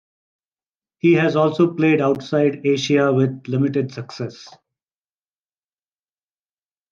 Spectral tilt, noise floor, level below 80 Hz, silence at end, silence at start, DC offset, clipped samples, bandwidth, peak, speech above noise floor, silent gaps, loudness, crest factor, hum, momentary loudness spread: -7 dB/octave; under -90 dBFS; -68 dBFS; 2.45 s; 1.05 s; under 0.1%; under 0.1%; 7.4 kHz; -4 dBFS; over 72 dB; none; -18 LUFS; 16 dB; none; 13 LU